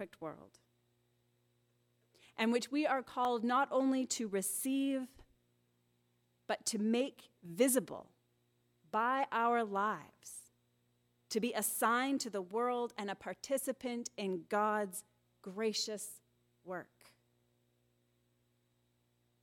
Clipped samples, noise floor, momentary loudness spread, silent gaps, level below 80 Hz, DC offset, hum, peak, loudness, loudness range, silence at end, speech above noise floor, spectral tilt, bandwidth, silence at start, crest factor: under 0.1%; -77 dBFS; 16 LU; none; -80 dBFS; under 0.1%; none; -18 dBFS; -36 LUFS; 8 LU; 2.6 s; 41 dB; -3 dB/octave; 17.5 kHz; 0 s; 20 dB